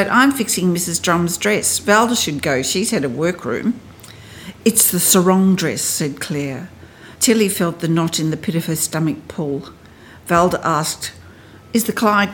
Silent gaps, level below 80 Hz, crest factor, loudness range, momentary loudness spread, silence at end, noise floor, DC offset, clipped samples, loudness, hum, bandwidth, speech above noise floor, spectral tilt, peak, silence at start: none; -52 dBFS; 18 dB; 4 LU; 12 LU; 0 s; -42 dBFS; under 0.1%; under 0.1%; -17 LUFS; none; 18 kHz; 25 dB; -3.5 dB/octave; 0 dBFS; 0 s